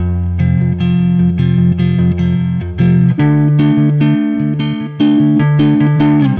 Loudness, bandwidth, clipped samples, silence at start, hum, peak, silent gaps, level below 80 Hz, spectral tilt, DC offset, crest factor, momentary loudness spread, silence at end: -12 LUFS; 4.4 kHz; under 0.1%; 0 s; none; -2 dBFS; none; -34 dBFS; -11 dB/octave; under 0.1%; 8 dB; 5 LU; 0 s